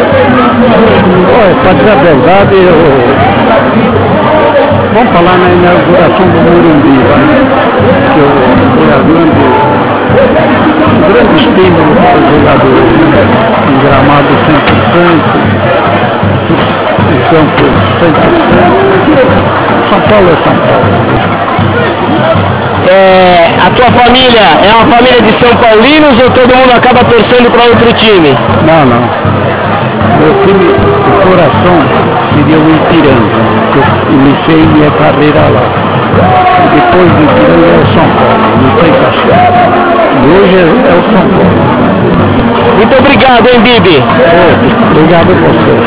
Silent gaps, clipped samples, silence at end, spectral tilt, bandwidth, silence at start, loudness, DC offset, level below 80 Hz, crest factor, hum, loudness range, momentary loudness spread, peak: none; 10%; 0 s; -10.5 dB/octave; 4 kHz; 0 s; -4 LUFS; under 0.1%; -26 dBFS; 4 dB; none; 3 LU; 4 LU; 0 dBFS